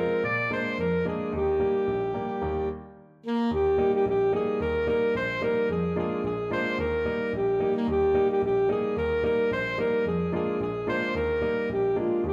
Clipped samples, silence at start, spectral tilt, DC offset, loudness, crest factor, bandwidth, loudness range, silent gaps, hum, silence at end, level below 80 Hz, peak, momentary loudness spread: under 0.1%; 0 s; -8 dB/octave; under 0.1%; -26 LUFS; 12 dB; 7.2 kHz; 2 LU; none; none; 0 s; -46 dBFS; -14 dBFS; 5 LU